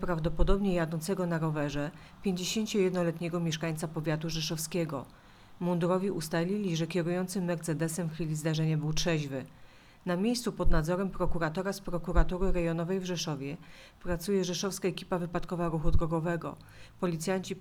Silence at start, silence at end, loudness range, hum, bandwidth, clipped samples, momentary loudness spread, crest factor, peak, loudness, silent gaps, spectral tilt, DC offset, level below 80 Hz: 0 s; 0 s; 2 LU; none; 16 kHz; under 0.1%; 7 LU; 20 dB; -10 dBFS; -32 LUFS; none; -5.5 dB/octave; under 0.1%; -38 dBFS